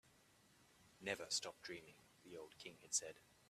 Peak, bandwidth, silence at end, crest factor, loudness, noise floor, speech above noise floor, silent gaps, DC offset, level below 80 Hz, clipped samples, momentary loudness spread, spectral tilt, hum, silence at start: -26 dBFS; 15 kHz; 0.25 s; 26 dB; -46 LUFS; -72 dBFS; 23 dB; none; under 0.1%; -84 dBFS; under 0.1%; 16 LU; -0.5 dB/octave; none; 0.05 s